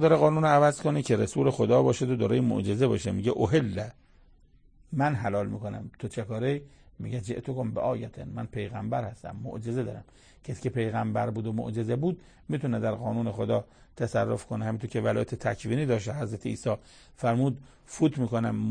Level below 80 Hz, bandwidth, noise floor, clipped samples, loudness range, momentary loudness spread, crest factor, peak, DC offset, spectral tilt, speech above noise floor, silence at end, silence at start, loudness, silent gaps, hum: -56 dBFS; 9.8 kHz; -58 dBFS; under 0.1%; 8 LU; 14 LU; 20 dB; -8 dBFS; under 0.1%; -7 dB/octave; 30 dB; 0 s; 0 s; -28 LUFS; none; none